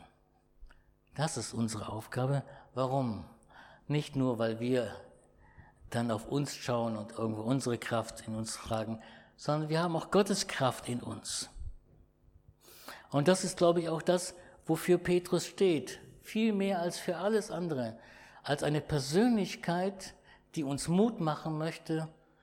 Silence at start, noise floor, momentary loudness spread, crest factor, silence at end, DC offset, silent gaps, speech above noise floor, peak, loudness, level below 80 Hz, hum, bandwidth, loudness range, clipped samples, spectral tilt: 0 s; -68 dBFS; 15 LU; 20 dB; 0.3 s; under 0.1%; none; 35 dB; -14 dBFS; -33 LUFS; -60 dBFS; none; 18.5 kHz; 5 LU; under 0.1%; -5.5 dB/octave